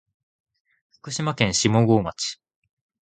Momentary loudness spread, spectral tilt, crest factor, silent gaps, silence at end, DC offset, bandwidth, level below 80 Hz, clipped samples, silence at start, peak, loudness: 12 LU; -4.5 dB/octave; 22 dB; none; 0.75 s; under 0.1%; 9.4 kHz; -52 dBFS; under 0.1%; 1.05 s; -4 dBFS; -22 LUFS